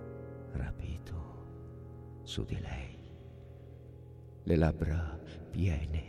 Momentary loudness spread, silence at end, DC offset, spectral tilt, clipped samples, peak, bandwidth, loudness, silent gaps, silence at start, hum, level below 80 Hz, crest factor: 21 LU; 0 s; under 0.1%; -7.5 dB/octave; under 0.1%; -16 dBFS; 10.5 kHz; -37 LUFS; none; 0 s; none; -44 dBFS; 22 dB